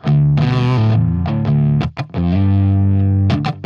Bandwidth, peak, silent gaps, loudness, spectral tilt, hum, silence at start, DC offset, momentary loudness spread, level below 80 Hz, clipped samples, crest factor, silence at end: 6.4 kHz; -4 dBFS; none; -15 LUFS; -9 dB/octave; 50 Hz at -35 dBFS; 0.05 s; under 0.1%; 4 LU; -34 dBFS; under 0.1%; 10 dB; 0 s